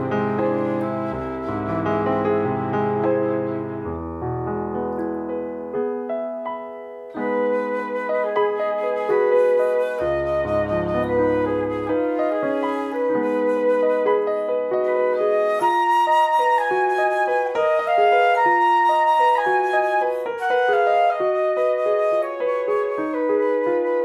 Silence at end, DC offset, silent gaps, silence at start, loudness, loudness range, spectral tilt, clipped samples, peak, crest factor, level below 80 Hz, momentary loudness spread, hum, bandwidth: 0 s; under 0.1%; none; 0 s; -21 LUFS; 8 LU; -7 dB/octave; under 0.1%; -6 dBFS; 14 dB; -50 dBFS; 10 LU; none; 12 kHz